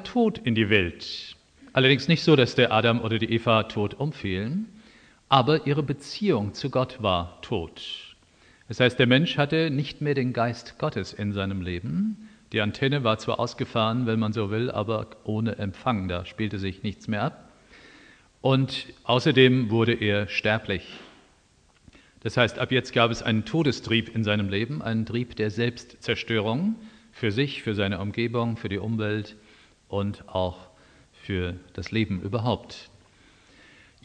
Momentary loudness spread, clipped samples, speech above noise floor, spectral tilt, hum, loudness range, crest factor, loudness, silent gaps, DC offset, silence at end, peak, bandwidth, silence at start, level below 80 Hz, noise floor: 12 LU; under 0.1%; 36 dB; -6.5 dB/octave; none; 8 LU; 22 dB; -25 LUFS; none; under 0.1%; 1.2 s; -4 dBFS; 9.6 kHz; 0 s; -56 dBFS; -61 dBFS